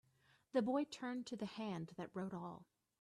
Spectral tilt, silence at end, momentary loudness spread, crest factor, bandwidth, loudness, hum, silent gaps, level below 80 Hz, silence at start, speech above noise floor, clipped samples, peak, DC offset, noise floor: -6 dB/octave; 0.4 s; 11 LU; 18 dB; 12 kHz; -44 LUFS; none; none; -82 dBFS; 0.55 s; 32 dB; under 0.1%; -26 dBFS; under 0.1%; -75 dBFS